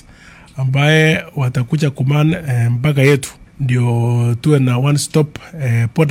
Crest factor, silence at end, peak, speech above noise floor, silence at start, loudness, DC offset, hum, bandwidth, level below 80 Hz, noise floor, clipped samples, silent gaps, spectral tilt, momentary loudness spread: 14 dB; 0 s; 0 dBFS; 27 dB; 0.55 s; -15 LUFS; under 0.1%; none; 15.5 kHz; -46 dBFS; -41 dBFS; under 0.1%; none; -6.5 dB/octave; 8 LU